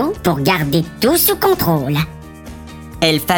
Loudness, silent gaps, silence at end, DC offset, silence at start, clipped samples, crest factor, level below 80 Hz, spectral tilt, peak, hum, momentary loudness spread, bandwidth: -15 LUFS; none; 0 s; under 0.1%; 0 s; under 0.1%; 16 dB; -38 dBFS; -4.5 dB/octave; 0 dBFS; none; 21 LU; over 20 kHz